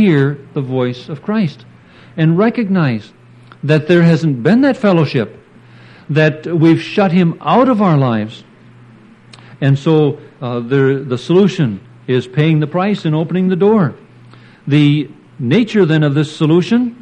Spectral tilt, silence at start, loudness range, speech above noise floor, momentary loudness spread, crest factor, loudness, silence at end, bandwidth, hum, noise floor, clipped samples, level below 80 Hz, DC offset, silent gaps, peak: -8 dB/octave; 0 s; 3 LU; 29 dB; 9 LU; 12 dB; -14 LUFS; 0.1 s; 8.8 kHz; none; -41 dBFS; under 0.1%; -58 dBFS; under 0.1%; none; 0 dBFS